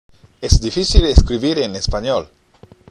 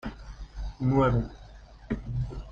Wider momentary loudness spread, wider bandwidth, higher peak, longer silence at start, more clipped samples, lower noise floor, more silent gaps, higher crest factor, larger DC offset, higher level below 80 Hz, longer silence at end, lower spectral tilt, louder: second, 8 LU vs 21 LU; first, 11.5 kHz vs 7.2 kHz; first, 0 dBFS vs -12 dBFS; first, 0.4 s vs 0.05 s; first, 0.3% vs under 0.1%; about the same, -47 dBFS vs -48 dBFS; neither; about the same, 16 dB vs 18 dB; neither; first, -18 dBFS vs -40 dBFS; first, 0.65 s vs 0 s; second, -5.5 dB/octave vs -9 dB/octave; first, -17 LUFS vs -29 LUFS